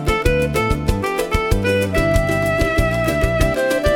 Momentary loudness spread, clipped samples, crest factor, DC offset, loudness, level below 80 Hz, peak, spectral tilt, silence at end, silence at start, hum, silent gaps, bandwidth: 3 LU; under 0.1%; 14 dB; under 0.1%; -18 LUFS; -24 dBFS; -2 dBFS; -5.5 dB/octave; 0 s; 0 s; none; none; 18 kHz